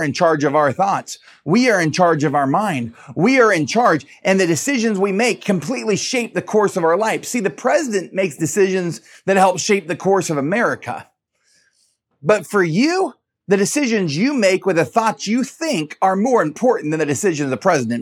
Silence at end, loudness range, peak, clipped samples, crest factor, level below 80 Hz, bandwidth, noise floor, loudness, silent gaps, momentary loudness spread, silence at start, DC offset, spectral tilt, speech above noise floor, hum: 0 s; 3 LU; 0 dBFS; under 0.1%; 16 dB; -68 dBFS; 16.5 kHz; -64 dBFS; -17 LUFS; none; 7 LU; 0 s; under 0.1%; -4.5 dB/octave; 47 dB; none